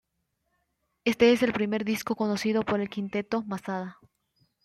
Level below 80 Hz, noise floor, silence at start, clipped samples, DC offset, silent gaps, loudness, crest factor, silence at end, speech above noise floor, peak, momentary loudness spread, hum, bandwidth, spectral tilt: -64 dBFS; -78 dBFS; 1.05 s; under 0.1%; under 0.1%; none; -27 LUFS; 20 dB; 0.75 s; 51 dB; -10 dBFS; 12 LU; none; 14.5 kHz; -5.5 dB/octave